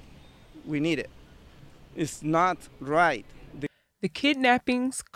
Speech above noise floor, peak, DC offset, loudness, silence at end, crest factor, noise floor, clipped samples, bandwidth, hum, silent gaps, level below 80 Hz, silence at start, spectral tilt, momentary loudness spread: 25 dB; -8 dBFS; under 0.1%; -26 LUFS; 0.1 s; 20 dB; -51 dBFS; under 0.1%; 15 kHz; none; none; -56 dBFS; 0.1 s; -4.5 dB/octave; 16 LU